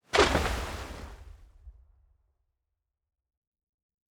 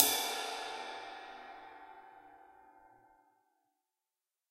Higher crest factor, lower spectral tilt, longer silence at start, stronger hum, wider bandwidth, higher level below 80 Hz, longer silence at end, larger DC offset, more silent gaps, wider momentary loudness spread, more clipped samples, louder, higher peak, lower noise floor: second, 26 dB vs 38 dB; first, -4 dB/octave vs 0.5 dB/octave; first, 0.15 s vs 0 s; neither; first, over 20 kHz vs 15.5 kHz; first, -44 dBFS vs -80 dBFS; first, 2.4 s vs 1.65 s; neither; neither; about the same, 24 LU vs 24 LU; neither; first, -28 LUFS vs -37 LUFS; second, -8 dBFS vs -4 dBFS; second, -85 dBFS vs under -90 dBFS